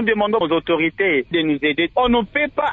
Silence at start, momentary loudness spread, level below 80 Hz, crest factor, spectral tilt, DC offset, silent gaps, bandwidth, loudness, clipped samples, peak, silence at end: 0 s; 2 LU; -44 dBFS; 14 dB; -7.5 dB/octave; under 0.1%; none; 4.2 kHz; -18 LUFS; under 0.1%; -6 dBFS; 0 s